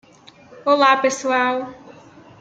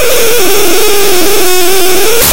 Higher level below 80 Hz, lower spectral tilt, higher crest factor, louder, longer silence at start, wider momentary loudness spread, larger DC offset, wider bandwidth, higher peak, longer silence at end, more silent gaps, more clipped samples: second, -68 dBFS vs -32 dBFS; about the same, -2.5 dB/octave vs -1.5 dB/octave; first, 20 dB vs 12 dB; second, -18 LUFS vs -7 LUFS; first, 0.5 s vs 0 s; first, 12 LU vs 0 LU; second, under 0.1% vs 50%; second, 9.2 kHz vs over 20 kHz; about the same, -2 dBFS vs 0 dBFS; first, 0.5 s vs 0 s; neither; second, under 0.1% vs 5%